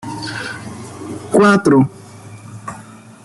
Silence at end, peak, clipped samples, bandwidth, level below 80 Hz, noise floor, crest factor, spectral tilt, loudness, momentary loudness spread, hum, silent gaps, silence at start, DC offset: 0.3 s; 0 dBFS; under 0.1%; 12 kHz; -54 dBFS; -38 dBFS; 16 dB; -6 dB/octave; -15 LUFS; 25 LU; none; none; 0.05 s; under 0.1%